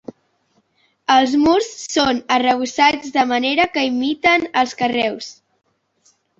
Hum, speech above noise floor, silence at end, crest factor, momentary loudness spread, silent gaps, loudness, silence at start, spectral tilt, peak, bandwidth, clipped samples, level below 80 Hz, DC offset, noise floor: none; 46 dB; 1.05 s; 18 dB; 6 LU; none; -17 LUFS; 1.1 s; -2.5 dB/octave; -2 dBFS; 8 kHz; under 0.1%; -54 dBFS; under 0.1%; -63 dBFS